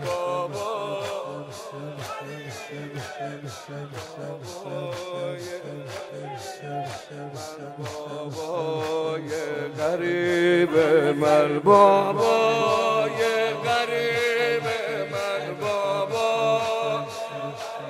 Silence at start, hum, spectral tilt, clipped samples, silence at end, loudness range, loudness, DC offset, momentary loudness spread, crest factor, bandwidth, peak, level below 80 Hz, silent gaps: 0 s; none; -5 dB/octave; under 0.1%; 0 s; 15 LU; -24 LUFS; under 0.1%; 16 LU; 22 dB; 15.5 kHz; -4 dBFS; -68 dBFS; none